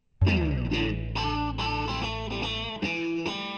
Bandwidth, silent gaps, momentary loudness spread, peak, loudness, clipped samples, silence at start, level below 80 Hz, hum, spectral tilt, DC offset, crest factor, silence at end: 8.4 kHz; none; 5 LU; -12 dBFS; -29 LUFS; under 0.1%; 0.2 s; -36 dBFS; none; -6 dB/octave; under 0.1%; 16 dB; 0 s